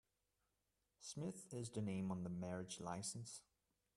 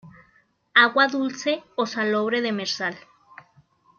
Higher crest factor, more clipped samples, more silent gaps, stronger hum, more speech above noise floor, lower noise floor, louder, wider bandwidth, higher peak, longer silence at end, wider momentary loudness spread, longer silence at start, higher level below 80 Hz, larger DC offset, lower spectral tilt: about the same, 18 dB vs 22 dB; neither; neither; neither; about the same, 40 dB vs 39 dB; first, -88 dBFS vs -62 dBFS; second, -48 LUFS vs -22 LUFS; first, 12.5 kHz vs 7.2 kHz; second, -32 dBFS vs -2 dBFS; second, 0.55 s vs 1 s; about the same, 9 LU vs 10 LU; first, 1 s vs 0.05 s; second, -80 dBFS vs -74 dBFS; neither; first, -5 dB/octave vs -3.5 dB/octave